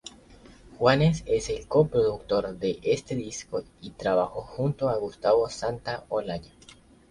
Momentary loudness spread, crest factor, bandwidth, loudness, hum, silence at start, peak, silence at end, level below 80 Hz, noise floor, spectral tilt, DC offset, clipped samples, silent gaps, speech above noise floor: 11 LU; 22 dB; 11.5 kHz; -27 LUFS; none; 0.05 s; -6 dBFS; 0.65 s; -50 dBFS; -53 dBFS; -6 dB/octave; under 0.1%; under 0.1%; none; 27 dB